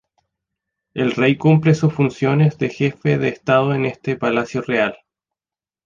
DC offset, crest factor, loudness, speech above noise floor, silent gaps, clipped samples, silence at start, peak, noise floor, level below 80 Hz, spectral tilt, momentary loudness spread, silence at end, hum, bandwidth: under 0.1%; 16 dB; -18 LUFS; over 73 dB; none; under 0.1%; 0.95 s; -2 dBFS; under -90 dBFS; -56 dBFS; -7.5 dB/octave; 8 LU; 0.9 s; none; 7.4 kHz